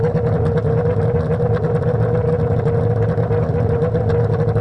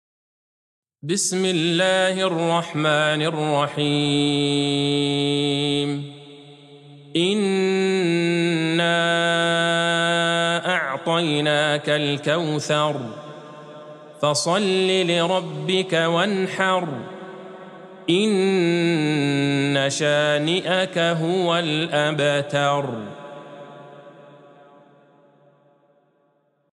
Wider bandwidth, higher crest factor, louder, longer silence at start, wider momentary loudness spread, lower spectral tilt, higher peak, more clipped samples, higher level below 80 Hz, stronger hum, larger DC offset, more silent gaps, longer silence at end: second, 5.8 kHz vs 12.5 kHz; second, 8 dB vs 16 dB; about the same, -18 LUFS vs -20 LUFS; second, 0 s vs 1.05 s; second, 1 LU vs 17 LU; first, -10.5 dB/octave vs -4.5 dB/octave; about the same, -8 dBFS vs -6 dBFS; neither; first, -36 dBFS vs -72 dBFS; neither; neither; neither; second, 0 s vs 2.45 s